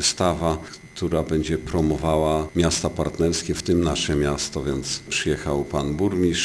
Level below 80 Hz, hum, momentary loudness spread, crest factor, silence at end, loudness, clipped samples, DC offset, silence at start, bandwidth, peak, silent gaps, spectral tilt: -36 dBFS; none; 5 LU; 16 dB; 0 s; -23 LUFS; under 0.1%; under 0.1%; 0 s; 11 kHz; -6 dBFS; none; -4.5 dB/octave